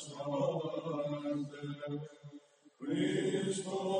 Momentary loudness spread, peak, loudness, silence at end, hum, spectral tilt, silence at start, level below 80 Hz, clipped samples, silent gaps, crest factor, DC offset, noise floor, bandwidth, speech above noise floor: 15 LU; -22 dBFS; -37 LUFS; 0 s; none; -5.5 dB/octave; 0 s; -82 dBFS; under 0.1%; none; 14 dB; under 0.1%; -58 dBFS; 10 kHz; 20 dB